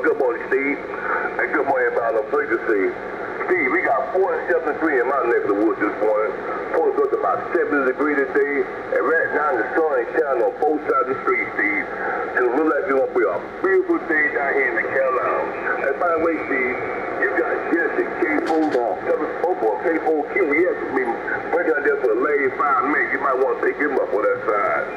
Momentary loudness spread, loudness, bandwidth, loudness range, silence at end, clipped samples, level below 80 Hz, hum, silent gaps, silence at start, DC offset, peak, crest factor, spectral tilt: 4 LU; -20 LUFS; 8 kHz; 1 LU; 0 s; under 0.1%; -56 dBFS; none; none; 0 s; under 0.1%; -6 dBFS; 14 dB; -7 dB/octave